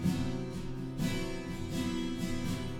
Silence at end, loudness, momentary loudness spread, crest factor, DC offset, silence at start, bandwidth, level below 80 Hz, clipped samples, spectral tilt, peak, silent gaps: 0 s; -36 LUFS; 5 LU; 16 dB; under 0.1%; 0 s; 18 kHz; -46 dBFS; under 0.1%; -6 dB/octave; -20 dBFS; none